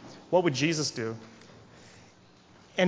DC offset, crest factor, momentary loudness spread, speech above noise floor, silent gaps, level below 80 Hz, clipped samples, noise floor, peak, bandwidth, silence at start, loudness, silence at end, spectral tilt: under 0.1%; 22 dB; 16 LU; 29 dB; none; -70 dBFS; under 0.1%; -57 dBFS; -10 dBFS; 8 kHz; 0 s; -28 LUFS; 0 s; -4.5 dB/octave